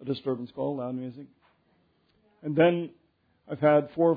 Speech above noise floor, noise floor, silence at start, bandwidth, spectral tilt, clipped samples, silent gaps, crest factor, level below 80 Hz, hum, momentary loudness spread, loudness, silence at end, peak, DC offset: 42 dB; -68 dBFS; 0 s; 4.9 kHz; -10.5 dB/octave; under 0.1%; none; 18 dB; -72 dBFS; none; 18 LU; -27 LUFS; 0 s; -10 dBFS; under 0.1%